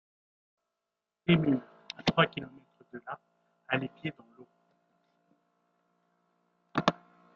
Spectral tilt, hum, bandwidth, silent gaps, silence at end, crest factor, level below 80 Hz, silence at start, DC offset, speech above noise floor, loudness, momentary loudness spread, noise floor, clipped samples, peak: -4.5 dB/octave; none; 7.2 kHz; none; 0.45 s; 30 dB; -66 dBFS; 1.3 s; under 0.1%; 58 dB; -31 LUFS; 20 LU; -88 dBFS; under 0.1%; -6 dBFS